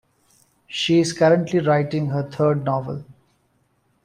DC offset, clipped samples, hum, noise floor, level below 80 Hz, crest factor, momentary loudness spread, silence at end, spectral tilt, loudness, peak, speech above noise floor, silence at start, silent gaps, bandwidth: under 0.1%; under 0.1%; none; -65 dBFS; -60 dBFS; 16 dB; 12 LU; 0.9 s; -6 dB/octave; -20 LUFS; -4 dBFS; 46 dB; 0.7 s; none; 11 kHz